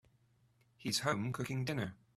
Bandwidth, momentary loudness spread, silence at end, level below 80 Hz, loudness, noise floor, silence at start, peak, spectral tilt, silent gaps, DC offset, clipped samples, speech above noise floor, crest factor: 15 kHz; 6 LU; 0.25 s; -70 dBFS; -38 LUFS; -72 dBFS; 0.8 s; -18 dBFS; -4.5 dB/octave; none; under 0.1%; under 0.1%; 35 dB; 22 dB